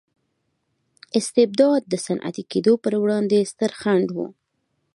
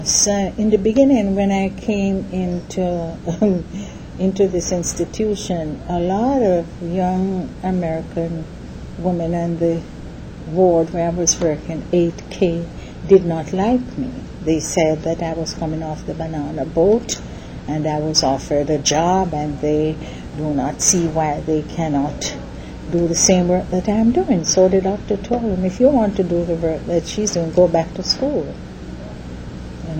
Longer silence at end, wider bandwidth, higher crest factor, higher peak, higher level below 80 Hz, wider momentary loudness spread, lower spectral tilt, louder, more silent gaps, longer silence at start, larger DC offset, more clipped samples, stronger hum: first, 0.65 s vs 0 s; second, 11.5 kHz vs 16.5 kHz; about the same, 18 dB vs 18 dB; second, -4 dBFS vs 0 dBFS; second, -70 dBFS vs -36 dBFS; second, 9 LU vs 15 LU; about the same, -5.5 dB/octave vs -5 dB/octave; about the same, -21 LUFS vs -19 LUFS; neither; first, 1.15 s vs 0 s; neither; neither; neither